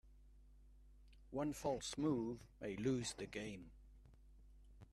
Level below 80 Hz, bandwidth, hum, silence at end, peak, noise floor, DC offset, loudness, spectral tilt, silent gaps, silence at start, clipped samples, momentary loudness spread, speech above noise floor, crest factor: -64 dBFS; 13.5 kHz; none; 0.05 s; -28 dBFS; -64 dBFS; under 0.1%; -44 LUFS; -5 dB/octave; none; 0.05 s; under 0.1%; 13 LU; 21 dB; 18 dB